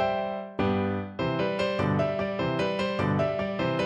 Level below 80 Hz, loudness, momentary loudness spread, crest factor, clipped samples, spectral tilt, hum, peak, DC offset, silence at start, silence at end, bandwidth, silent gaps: -54 dBFS; -28 LUFS; 4 LU; 14 dB; under 0.1%; -7.5 dB/octave; none; -14 dBFS; under 0.1%; 0 s; 0 s; 9.8 kHz; none